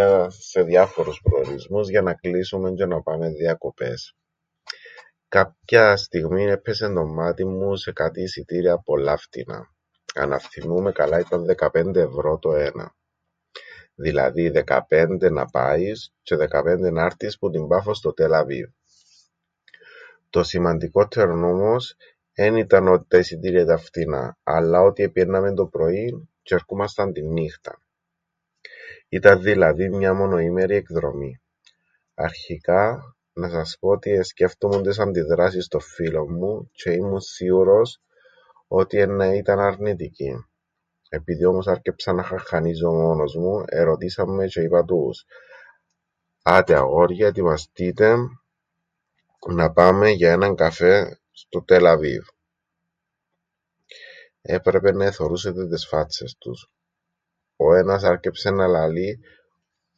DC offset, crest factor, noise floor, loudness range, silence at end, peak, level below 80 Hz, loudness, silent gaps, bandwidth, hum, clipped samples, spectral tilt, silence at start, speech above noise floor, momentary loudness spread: under 0.1%; 20 dB; -81 dBFS; 6 LU; 0.8 s; 0 dBFS; -44 dBFS; -20 LUFS; none; 7.8 kHz; none; under 0.1%; -6.5 dB/octave; 0 s; 61 dB; 15 LU